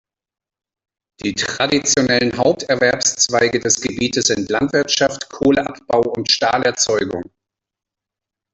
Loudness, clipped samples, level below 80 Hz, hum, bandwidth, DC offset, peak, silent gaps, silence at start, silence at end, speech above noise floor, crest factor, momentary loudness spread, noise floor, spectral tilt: -17 LUFS; under 0.1%; -52 dBFS; none; 8.4 kHz; under 0.1%; -2 dBFS; none; 1.25 s; 1.3 s; 68 dB; 18 dB; 6 LU; -86 dBFS; -2.5 dB/octave